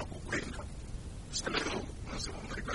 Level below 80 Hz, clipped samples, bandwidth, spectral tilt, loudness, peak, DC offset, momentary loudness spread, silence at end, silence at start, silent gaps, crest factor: -46 dBFS; under 0.1%; 11.5 kHz; -3.5 dB/octave; -38 LUFS; -18 dBFS; under 0.1%; 11 LU; 0 s; 0 s; none; 20 dB